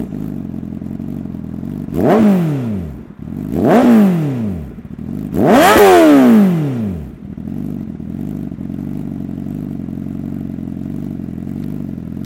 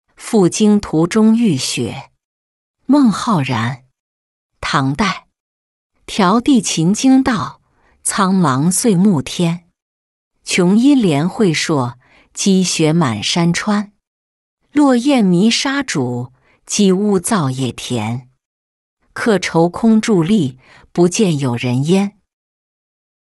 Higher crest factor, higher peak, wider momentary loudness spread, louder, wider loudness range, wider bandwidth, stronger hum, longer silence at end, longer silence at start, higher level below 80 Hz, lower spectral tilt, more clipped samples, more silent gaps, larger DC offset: about the same, 14 dB vs 14 dB; about the same, 0 dBFS vs -2 dBFS; first, 18 LU vs 12 LU; about the same, -15 LUFS vs -15 LUFS; first, 14 LU vs 4 LU; first, 17 kHz vs 12 kHz; neither; second, 0 s vs 1.15 s; second, 0 s vs 0.2 s; first, -40 dBFS vs -50 dBFS; first, -6.5 dB/octave vs -5 dB/octave; neither; second, none vs 2.24-2.74 s, 4.00-4.49 s, 5.40-5.90 s, 9.82-10.31 s, 14.07-14.57 s, 18.45-18.97 s; neither